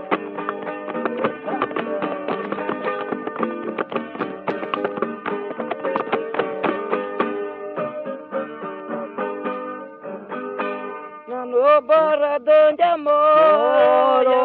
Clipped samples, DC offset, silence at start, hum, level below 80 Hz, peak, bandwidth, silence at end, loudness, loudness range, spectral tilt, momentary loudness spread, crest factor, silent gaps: under 0.1%; under 0.1%; 0 s; none; -70 dBFS; -2 dBFS; 4.6 kHz; 0 s; -21 LUFS; 12 LU; -3 dB/octave; 15 LU; 18 dB; none